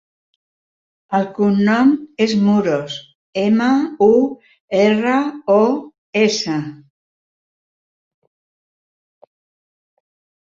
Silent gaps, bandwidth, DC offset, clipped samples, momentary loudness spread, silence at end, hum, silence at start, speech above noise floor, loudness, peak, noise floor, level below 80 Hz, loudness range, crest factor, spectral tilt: 3.15-3.33 s, 4.60-4.68 s, 5.98-6.13 s; 7.6 kHz; under 0.1%; under 0.1%; 10 LU; 3.8 s; none; 1.1 s; over 75 dB; -16 LUFS; -2 dBFS; under -90 dBFS; -62 dBFS; 8 LU; 16 dB; -6 dB/octave